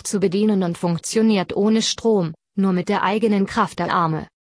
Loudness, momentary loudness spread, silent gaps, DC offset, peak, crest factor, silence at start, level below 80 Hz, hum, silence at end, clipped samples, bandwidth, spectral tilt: -20 LUFS; 4 LU; none; under 0.1%; -4 dBFS; 14 dB; 0.05 s; -56 dBFS; none; 0.25 s; under 0.1%; 11 kHz; -5.5 dB/octave